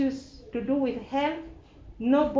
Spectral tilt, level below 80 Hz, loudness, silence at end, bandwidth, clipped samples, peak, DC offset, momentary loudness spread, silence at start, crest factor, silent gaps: -6.5 dB/octave; -52 dBFS; -29 LUFS; 0 s; 7.6 kHz; under 0.1%; -12 dBFS; under 0.1%; 14 LU; 0 s; 16 dB; none